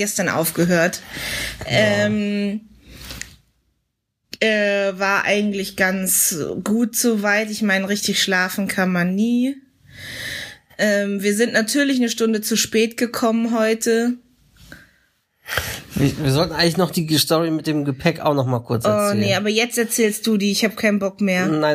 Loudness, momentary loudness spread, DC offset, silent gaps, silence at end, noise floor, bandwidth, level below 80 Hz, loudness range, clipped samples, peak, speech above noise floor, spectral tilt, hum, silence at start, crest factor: -19 LUFS; 10 LU; under 0.1%; none; 0 s; -74 dBFS; 15.5 kHz; -50 dBFS; 4 LU; under 0.1%; -2 dBFS; 55 dB; -4 dB/octave; none; 0 s; 18 dB